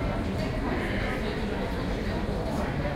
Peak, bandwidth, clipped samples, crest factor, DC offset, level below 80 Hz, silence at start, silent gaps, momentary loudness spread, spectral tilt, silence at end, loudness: -16 dBFS; 16 kHz; under 0.1%; 14 dB; under 0.1%; -34 dBFS; 0 s; none; 2 LU; -6.5 dB/octave; 0 s; -30 LUFS